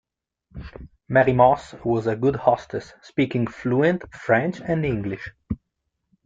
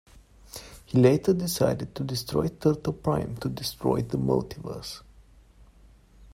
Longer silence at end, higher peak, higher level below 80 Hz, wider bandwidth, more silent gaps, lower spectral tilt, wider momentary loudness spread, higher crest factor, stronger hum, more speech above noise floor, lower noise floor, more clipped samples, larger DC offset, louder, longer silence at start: first, 0.7 s vs 0.05 s; about the same, -4 dBFS vs -6 dBFS; about the same, -48 dBFS vs -50 dBFS; second, 7.8 kHz vs 16 kHz; neither; first, -8 dB/octave vs -6.5 dB/octave; second, 16 LU vs 19 LU; about the same, 20 dB vs 22 dB; neither; first, 56 dB vs 29 dB; first, -78 dBFS vs -55 dBFS; neither; neither; first, -22 LUFS vs -27 LUFS; about the same, 0.55 s vs 0.55 s